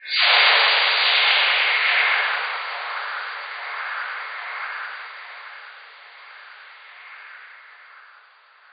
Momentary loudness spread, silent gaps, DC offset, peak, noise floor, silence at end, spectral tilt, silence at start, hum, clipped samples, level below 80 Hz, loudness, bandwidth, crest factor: 25 LU; none; under 0.1%; -2 dBFS; -52 dBFS; 0.75 s; 12 dB/octave; 0 s; none; under 0.1%; under -90 dBFS; -19 LUFS; 5.2 kHz; 20 dB